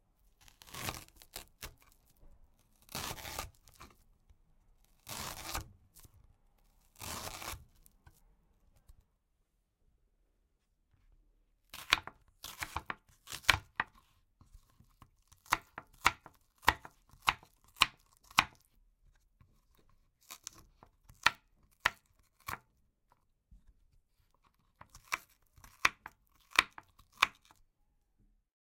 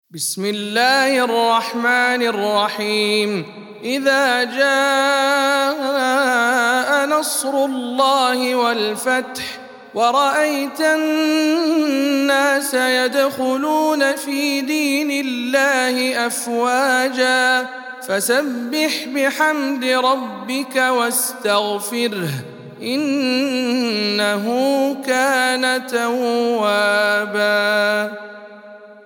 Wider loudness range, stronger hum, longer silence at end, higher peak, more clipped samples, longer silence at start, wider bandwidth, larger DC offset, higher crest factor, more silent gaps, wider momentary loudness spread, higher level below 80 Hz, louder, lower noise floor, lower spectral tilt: first, 14 LU vs 3 LU; neither; first, 1.45 s vs 0.05 s; second, -8 dBFS vs -2 dBFS; neither; first, 0.65 s vs 0.15 s; about the same, 16.5 kHz vs 18 kHz; neither; first, 34 dB vs 16 dB; neither; first, 20 LU vs 7 LU; first, -60 dBFS vs -74 dBFS; second, -35 LUFS vs -17 LUFS; first, -78 dBFS vs -40 dBFS; second, -1 dB/octave vs -2.5 dB/octave